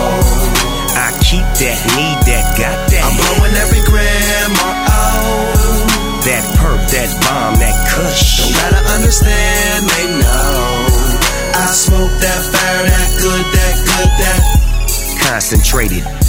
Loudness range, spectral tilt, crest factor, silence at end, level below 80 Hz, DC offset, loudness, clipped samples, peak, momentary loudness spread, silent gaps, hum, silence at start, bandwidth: 1 LU; -3.5 dB/octave; 10 dB; 0 s; -14 dBFS; under 0.1%; -12 LUFS; under 0.1%; 0 dBFS; 3 LU; none; none; 0 s; 16.5 kHz